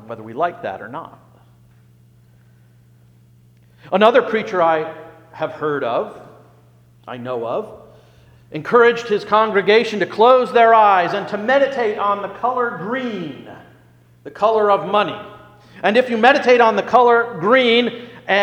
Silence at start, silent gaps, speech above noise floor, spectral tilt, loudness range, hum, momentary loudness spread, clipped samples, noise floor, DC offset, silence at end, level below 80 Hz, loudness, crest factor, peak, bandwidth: 0.05 s; none; 34 dB; -5.5 dB/octave; 12 LU; 60 Hz at -50 dBFS; 18 LU; under 0.1%; -50 dBFS; under 0.1%; 0 s; -62 dBFS; -16 LUFS; 18 dB; 0 dBFS; 9 kHz